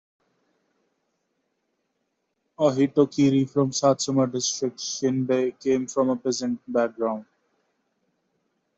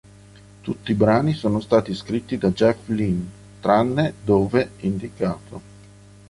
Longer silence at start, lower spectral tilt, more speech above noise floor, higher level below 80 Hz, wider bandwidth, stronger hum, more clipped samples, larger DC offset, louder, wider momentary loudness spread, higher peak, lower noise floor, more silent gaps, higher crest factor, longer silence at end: first, 2.6 s vs 0.65 s; second, -5 dB/octave vs -7.5 dB/octave; first, 53 dB vs 26 dB; second, -68 dBFS vs -48 dBFS; second, 8 kHz vs 11.5 kHz; second, none vs 50 Hz at -40 dBFS; neither; neither; second, -24 LUFS vs -21 LUFS; second, 7 LU vs 13 LU; second, -6 dBFS vs -2 dBFS; first, -76 dBFS vs -46 dBFS; neither; about the same, 20 dB vs 18 dB; first, 1.55 s vs 0.7 s